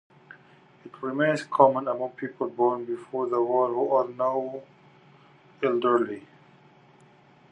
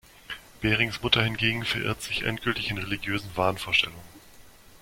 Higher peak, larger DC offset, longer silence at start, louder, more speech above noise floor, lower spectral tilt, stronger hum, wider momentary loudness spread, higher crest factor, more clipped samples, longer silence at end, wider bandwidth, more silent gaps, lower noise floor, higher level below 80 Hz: about the same, -4 dBFS vs -4 dBFS; neither; first, 0.85 s vs 0.3 s; about the same, -26 LUFS vs -26 LUFS; first, 31 dB vs 23 dB; first, -7 dB/octave vs -4.5 dB/octave; neither; first, 13 LU vs 8 LU; about the same, 24 dB vs 24 dB; neither; first, 1.3 s vs 0.05 s; second, 10 kHz vs 16.5 kHz; neither; first, -56 dBFS vs -51 dBFS; second, -82 dBFS vs -50 dBFS